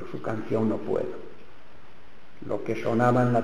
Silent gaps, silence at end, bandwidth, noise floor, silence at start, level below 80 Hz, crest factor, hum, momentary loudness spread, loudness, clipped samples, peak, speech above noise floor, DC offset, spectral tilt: none; 0 s; 11 kHz; -53 dBFS; 0 s; -62 dBFS; 18 dB; none; 20 LU; -27 LUFS; under 0.1%; -10 dBFS; 28 dB; 2%; -8.5 dB/octave